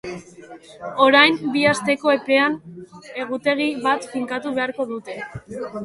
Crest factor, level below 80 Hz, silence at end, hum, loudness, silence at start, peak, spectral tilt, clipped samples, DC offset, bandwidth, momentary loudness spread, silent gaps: 20 dB; -60 dBFS; 0 s; none; -19 LUFS; 0.05 s; -2 dBFS; -4 dB/octave; under 0.1%; under 0.1%; 11.5 kHz; 20 LU; none